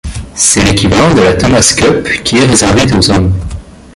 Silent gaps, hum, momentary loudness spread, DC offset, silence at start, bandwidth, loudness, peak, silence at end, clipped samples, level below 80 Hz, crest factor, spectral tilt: none; none; 9 LU; under 0.1%; 0.05 s; 16 kHz; -8 LUFS; 0 dBFS; 0.25 s; 0.2%; -24 dBFS; 8 dB; -4 dB/octave